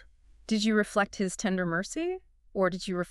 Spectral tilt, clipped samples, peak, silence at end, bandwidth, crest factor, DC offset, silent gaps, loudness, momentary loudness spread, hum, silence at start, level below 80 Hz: -4.5 dB/octave; under 0.1%; -12 dBFS; 0 s; 12.5 kHz; 18 dB; under 0.1%; none; -29 LUFS; 11 LU; none; 0.5 s; -56 dBFS